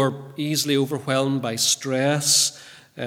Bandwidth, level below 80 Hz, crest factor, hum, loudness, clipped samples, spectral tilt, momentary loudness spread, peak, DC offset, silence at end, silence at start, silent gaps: 18 kHz; -72 dBFS; 18 dB; none; -21 LUFS; under 0.1%; -3 dB/octave; 7 LU; -4 dBFS; under 0.1%; 0 s; 0 s; none